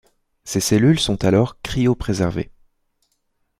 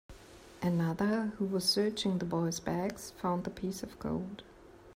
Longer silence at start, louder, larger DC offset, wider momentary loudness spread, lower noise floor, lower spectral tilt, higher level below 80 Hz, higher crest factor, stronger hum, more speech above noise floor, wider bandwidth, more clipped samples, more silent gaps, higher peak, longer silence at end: first, 0.45 s vs 0.1 s; first, -19 LUFS vs -34 LUFS; neither; about the same, 13 LU vs 11 LU; first, -69 dBFS vs -54 dBFS; about the same, -5.5 dB/octave vs -5 dB/octave; first, -40 dBFS vs -60 dBFS; about the same, 16 dB vs 18 dB; neither; first, 51 dB vs 21 dB; about the same, 16 kHz vs 16 kHz; neither; neither; first, -4 dBFS vs -16 dBFS; first, 1.15 s vs 0 s